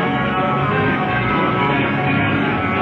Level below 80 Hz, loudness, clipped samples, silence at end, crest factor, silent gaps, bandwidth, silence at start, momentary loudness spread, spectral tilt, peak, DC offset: -40 dBFS; -17 LUFS; under 0.1%; 0 s; 14 dB; none; 6.8 kHz; 0 s; 1 LU; -8.5 dB/octave; -4 dBFS; under 0.1%